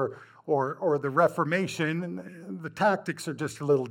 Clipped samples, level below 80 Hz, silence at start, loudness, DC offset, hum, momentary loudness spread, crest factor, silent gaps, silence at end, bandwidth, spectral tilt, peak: under 0.1%; -74 dBFS; 0 s; -28 LUFS; under 0.1%; none; 14 LU; 18 dB; none; 0 s; 16.5 kHz; -6 dB/octave; -10 dBFS